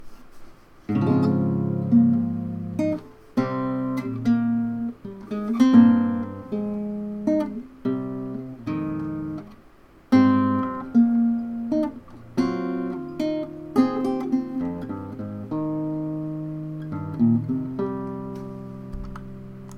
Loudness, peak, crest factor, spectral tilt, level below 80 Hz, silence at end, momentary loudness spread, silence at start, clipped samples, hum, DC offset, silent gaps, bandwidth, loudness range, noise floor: -24 LUFS; -4 dBFS; 20 dB; -8.5 dB/octave; -52 dBFS; 0 s; 15 LU; 0 s; under 0.1%; none; under 0.1%; none; 6.4 kHz; 6 LU; -51 dBFS